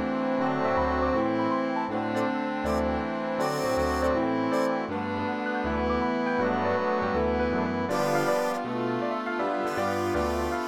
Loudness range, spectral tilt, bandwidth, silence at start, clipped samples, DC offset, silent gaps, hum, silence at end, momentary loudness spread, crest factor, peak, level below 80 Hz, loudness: 1 LU; -6 dB/octave; 18 kHz; 0 s; under 0.1%; under 0.1%; none; none; 0 s; 4 LU; 14 dB; -12 dBFS; -44 dBFS; -27 LUFS